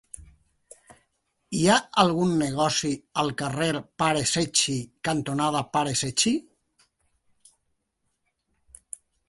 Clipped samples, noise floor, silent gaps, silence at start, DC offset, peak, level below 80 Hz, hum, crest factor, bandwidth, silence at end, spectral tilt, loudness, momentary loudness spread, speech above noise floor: under 0.1%; -77 dBFS; none; 0.2 s; under 0.1%; -4 dBFS; -58 dBFS; none; 22 dB; 12 kHz; 2.85 s; -3.5 dB/octave; -24 LUFS; 10 LU; 52 dB